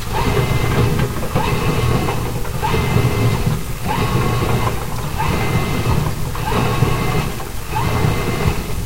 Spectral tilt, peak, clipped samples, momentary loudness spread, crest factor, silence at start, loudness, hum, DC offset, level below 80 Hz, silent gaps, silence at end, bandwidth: -5.5 dB/octave; 0 dBFS; under 0.1%; 6 LU; 16 dB; 0 s; -19 LUFS; none; 5%; -26 dBFS; none; 0 s; 16 kHz